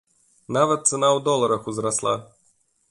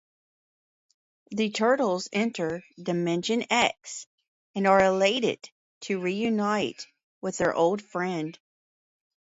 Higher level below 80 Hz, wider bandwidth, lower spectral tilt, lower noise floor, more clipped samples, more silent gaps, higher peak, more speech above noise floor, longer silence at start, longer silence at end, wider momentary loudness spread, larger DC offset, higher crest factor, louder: about the same, -64 dBFS vs -64 dBFS; first, 11.5 kHz vs 8 kHz; about the same, -3.5 dB/octave vs -4.5 dB/octave; second, -65 dBFS vs under -90 dBFS; neither; second, none vs 4.07-4.18 s, 4.28-4.54 s, 5.52-5.81 s, 7.03-7.21 s; first, -4 dBFS vs -8 dBFS; second, 43 dB vs over 64 dB; second, 0.5 s vs 1.3 s; second, 0.65 s vs 1.05 s; second, 7 LU vs 16 LU; neither; about the same, 18 dB vs 20 dB; first, -22 LUFS vs -26 LUFS